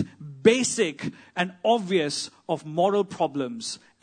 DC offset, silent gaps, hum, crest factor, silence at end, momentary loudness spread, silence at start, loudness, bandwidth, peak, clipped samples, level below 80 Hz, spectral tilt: under 0.1%; none; none; 20 dB; 0.25 s; 12 LU; 0 s; -25 LUFS; 9.6 kHz; -4 dBFS; under 0.1%; -70 dBFS; -4 dB/octave